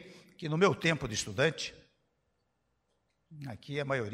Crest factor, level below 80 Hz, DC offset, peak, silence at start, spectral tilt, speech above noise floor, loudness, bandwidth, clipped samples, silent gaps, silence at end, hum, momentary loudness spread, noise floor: 22 dB; -64 dBFS; under 0.1%; -14 dBFS; 0 s; -4.5 dB/octave; 47 dB; -31 LUFS; 14.5 kHz; under 0.1%; none; 0 s; none; 17 LU; -79 dBFS